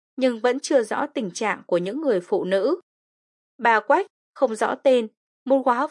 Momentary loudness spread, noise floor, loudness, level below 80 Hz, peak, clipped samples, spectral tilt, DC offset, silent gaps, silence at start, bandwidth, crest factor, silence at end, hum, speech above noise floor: 7 LU; under -90 dBFS; -22 LUFS; -84 dBFS; -4 dBFS; under 0.1%; -4.5 dB/octave; under 0.1%; 2.83-3.59 s, 4.10-4.33 s, 5.17-5.46 s; 0.2 s; 11.5 kHz; 18 dB; 0 s; none; over 69 dB